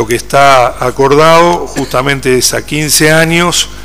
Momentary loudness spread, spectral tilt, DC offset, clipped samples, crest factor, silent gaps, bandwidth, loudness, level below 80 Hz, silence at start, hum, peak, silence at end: 7 LU; -3.5 dB/octave; 6%; 2%; 8 dB; none; over 20 kHz; -8 LUFS; -32 dBFS; 0 s; none; 0 dBFS; 0 s